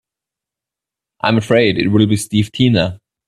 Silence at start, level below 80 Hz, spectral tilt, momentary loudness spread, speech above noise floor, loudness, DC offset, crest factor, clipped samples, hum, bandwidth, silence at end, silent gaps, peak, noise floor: 1.25 s; -48 dBFS; -6 dB/octave; 6 LU; 72 dB; -15 LUFS; under 0.1%; 16 dB; under 0.1%; none; 13.5 kHz; 0.3 s; none; 0 dBFS; -86 dBFS